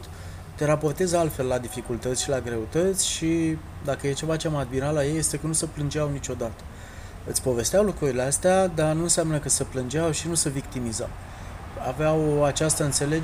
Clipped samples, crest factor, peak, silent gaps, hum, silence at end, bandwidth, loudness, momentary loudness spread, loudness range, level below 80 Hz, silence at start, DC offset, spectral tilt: under 0.1%; 18 dB; -8 dBFS; none; none; 0 s; 15.5 kHz; -25 LUFS; 12 LU; 4 LU; -42 dBFS; 0 s; under 0.1%; -4.5 dB/octave